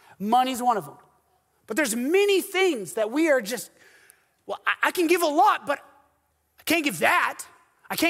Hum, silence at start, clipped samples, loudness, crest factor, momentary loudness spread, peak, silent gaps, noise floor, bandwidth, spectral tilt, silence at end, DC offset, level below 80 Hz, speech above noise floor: none; 0.2 s; under 0.1%; -23 LUFS; 22 dB; 13 LU; -4 dBFS; none; -69 dBFS; 16 kHz; -3 dB/octave; 0 s; under 0.1%; -72 dBFS; 46 dB